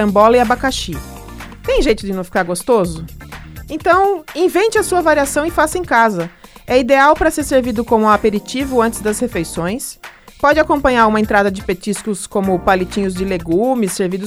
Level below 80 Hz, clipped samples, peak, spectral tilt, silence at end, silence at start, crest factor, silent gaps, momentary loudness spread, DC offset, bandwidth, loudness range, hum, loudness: -34 dBFS; under 0.1%; 0 dBFS; -4.5 dB/octave; 0 s; 0 s; 16 dB; none; 14 LU; under 0.1%; over 20 kHz; 3 LU; none; -15 LUFS